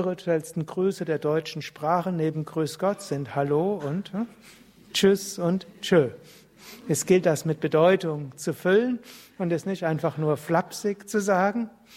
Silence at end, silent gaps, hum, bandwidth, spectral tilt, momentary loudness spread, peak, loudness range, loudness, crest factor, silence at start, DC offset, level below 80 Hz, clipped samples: 0 s; none; none; 16 kHz; -5.5 dB/octave; 11 LU; -6 dBFS; 3 LU; -26 LUFS; 18 dB; 0 s; under 0.1%; -66 dBFS; under 0.1%